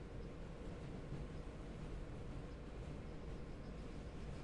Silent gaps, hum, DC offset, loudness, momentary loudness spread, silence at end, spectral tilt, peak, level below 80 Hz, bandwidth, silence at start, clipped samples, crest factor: none; none; under 0.1%; -52 LUFS; 2 LU; 0 s; -7 dB/octave; -36 dBFS; -52 dBFS; 11 kHz; 0 s; under 0.1%; 12 dB